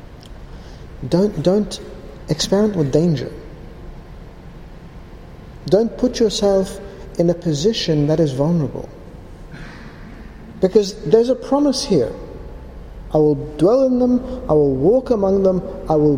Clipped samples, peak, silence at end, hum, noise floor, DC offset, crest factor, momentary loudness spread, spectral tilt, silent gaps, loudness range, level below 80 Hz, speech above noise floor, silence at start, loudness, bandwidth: under 0.1%; 0 dBFS; 0 s; none; -37 dBFS; under 0.1%; 18 dB; 23 LU; -6.5 dB/octave; none; 5 LU; -38 dBFS; 20 dB; 0 s; -17 LUFS; 15.5 kHz